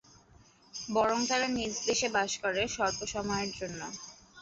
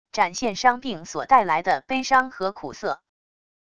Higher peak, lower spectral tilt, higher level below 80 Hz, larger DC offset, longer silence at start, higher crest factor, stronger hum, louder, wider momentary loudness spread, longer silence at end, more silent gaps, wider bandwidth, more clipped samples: second, -14 dBFS vs -4 dBFS; about the same, -2 dB/octave vs -3 dB/octave; about the same, -58 dBFS vs -58 dBFS; second, under 0.1% vs 0.5%; first, 0.75 s vs 0.15 s; about the same, 18 dB vs 20 dB; neither; second, -31 LUFS vs -23 LUFS; about the same, 13 LU vs 12 LU; second, 0 s vs 0.8 s; neither; second, 8 kHz vs 10.5 kHz; neither